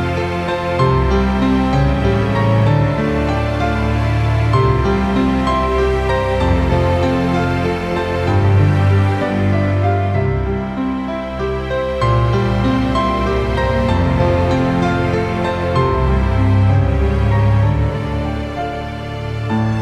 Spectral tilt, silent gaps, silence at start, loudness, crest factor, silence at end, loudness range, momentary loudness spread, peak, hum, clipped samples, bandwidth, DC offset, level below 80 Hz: -8 dB/octave; none; 0 s; -16 LUFS; 14 dB; 0 s; 2 LU; 7 LU; -2 dBFS; none; under 0.1%; 10 kHz; under 0.1%; -24 dBFS